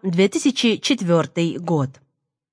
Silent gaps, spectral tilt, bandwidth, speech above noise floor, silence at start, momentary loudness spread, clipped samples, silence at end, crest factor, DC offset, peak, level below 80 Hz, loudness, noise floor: none; -5 dB/octave; 10.5 kHz; 50 dB; 0 s; 5 LU; under 0.1%; 0.6 s; 16 dB; under 0.1%; -4 dBFS; -68 dBFS; -20 LUFS; -69 dBFS